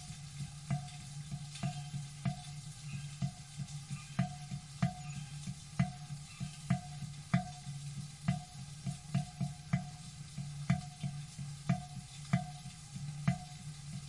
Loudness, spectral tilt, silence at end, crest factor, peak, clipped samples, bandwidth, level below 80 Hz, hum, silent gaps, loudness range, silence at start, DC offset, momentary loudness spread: -41 LUFS; -5.5 dB/octave; 0 s; 24 dB; -16 dBFS; under 0.1%; 11.5 kHz; -60 dBFS; none; none; 3 LU; 0 s; under 0.1%; 10 LU